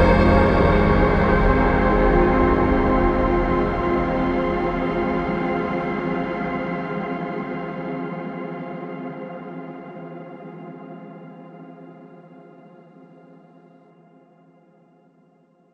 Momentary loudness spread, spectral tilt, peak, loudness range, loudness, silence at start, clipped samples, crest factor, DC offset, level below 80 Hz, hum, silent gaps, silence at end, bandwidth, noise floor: 21 LU; -9 dB/octave; -4 dBFS; 22 LU; -21 LUFS; 0 s; under 0.1%; 18 dB; under 0.1%; -30 dBFS; none; none; 3.4 s; 6.6 kHz; -58 dBFS